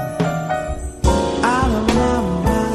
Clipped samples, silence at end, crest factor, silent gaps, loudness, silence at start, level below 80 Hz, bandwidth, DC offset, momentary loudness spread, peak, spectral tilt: under 0.1%; 0 s; 16 dB; none; -19 LUFS; 0 s; -26 dBFS; 13.5 kHz; under 0.1%; 6 LU; -2 dBFS; -6 dB/octave